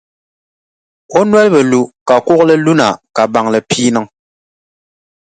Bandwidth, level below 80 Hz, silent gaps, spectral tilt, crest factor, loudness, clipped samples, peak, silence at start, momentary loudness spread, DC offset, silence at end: 9.4 kHz; -56 dBFS; 2.01-2.06 s; -5 dB/octave; 12 dB; -11 LUFS; under 0.1%; 0 dBFS; 1.1 s; 6 LU; under 0.1%; 1.25 s